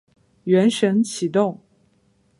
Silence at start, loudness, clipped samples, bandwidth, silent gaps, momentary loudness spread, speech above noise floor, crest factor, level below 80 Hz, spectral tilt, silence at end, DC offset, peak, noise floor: 0.45 s; -20 LUFS; under 0.1%; 11.5 kHz; none; 13 LU; 43 dB; 16 dB; -68 dBFS; -5.5 dB/octave; 0.85 s; under 0.1%; -6 dBFS; -62 dBFS